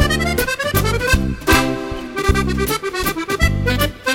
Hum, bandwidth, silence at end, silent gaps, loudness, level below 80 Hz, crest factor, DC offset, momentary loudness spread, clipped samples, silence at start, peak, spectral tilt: none; 17 kHz; 0 s; none; -18 LUFS; -24 dBFS; 16 dB; under 0.1%; 6 LU; under 0.1%; 0 s; -2 dBFS; -4.5 dB/octave